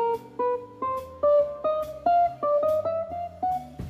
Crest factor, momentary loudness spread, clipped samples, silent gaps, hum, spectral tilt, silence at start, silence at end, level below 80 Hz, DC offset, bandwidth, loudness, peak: 14 dB; 8 LU; under 0.1%; none; none; -7 dB/octave; 0 s; 0 s; -56 dBFS; under 0.1%; 15 kHz; -26 LUFS; -12 dBFS